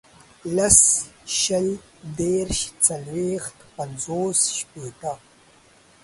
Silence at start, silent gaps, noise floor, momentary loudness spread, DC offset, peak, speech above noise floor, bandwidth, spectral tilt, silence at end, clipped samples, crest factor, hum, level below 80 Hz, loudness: 0.45 s; none; -54 dBFS; 21 LU; under 0.1%; 0 dBFS; 31 dB; 12 kHz; -2.5 dB/octave; 0.85 s; under 0.1%; 24 dB; none; -46 dBFS; -20 LUFS